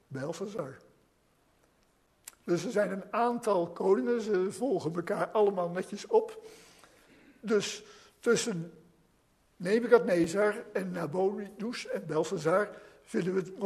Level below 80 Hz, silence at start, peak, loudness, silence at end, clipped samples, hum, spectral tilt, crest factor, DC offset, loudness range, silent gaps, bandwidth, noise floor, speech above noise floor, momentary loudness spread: -74 dBFS; 0.1 s; -8 dBFS; -31 LUFS; 0 s; under 0.1%; none; -5 dB/octave; 24 dB; under 0.1%; 5 LU; none; 13.5 kHz; -69 dBFS; 39 dB; 13 LU